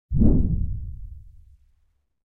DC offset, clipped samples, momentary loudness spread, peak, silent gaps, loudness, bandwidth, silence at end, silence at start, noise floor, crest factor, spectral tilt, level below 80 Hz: under 0.1%; under 0.1%; 22 LU; -4 dBFS; none; -24 LUFS; 1.5 kHz; 1.05 s; 0.1 s; -66 dBFS; 20 dB; -15 dB/octave; -28 dBFS